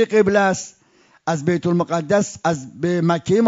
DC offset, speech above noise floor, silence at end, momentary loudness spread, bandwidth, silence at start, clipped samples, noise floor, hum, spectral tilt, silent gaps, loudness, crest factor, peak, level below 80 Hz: under 0.1%; 37 dB; 0 s; 10 LU; 7.8 kHz; 0 s; under 0.1%; -56 dBFS; none; -6 dB/octave; none; -20 LUFS; 14 dB; -4 dBFS; -58 dBFS